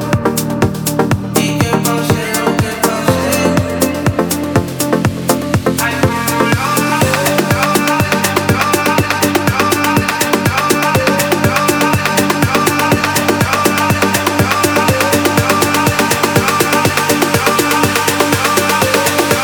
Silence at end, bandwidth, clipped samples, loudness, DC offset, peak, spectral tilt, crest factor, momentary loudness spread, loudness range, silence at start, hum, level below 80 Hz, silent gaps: 0 s; over 20 kHz; under 0.1%; -12 LUFS; under 0.1%; 0 dBFS; -4 dB/octave; 12 dB; 3 LU; 3 LU; 0 s; none; -38 dBFS; none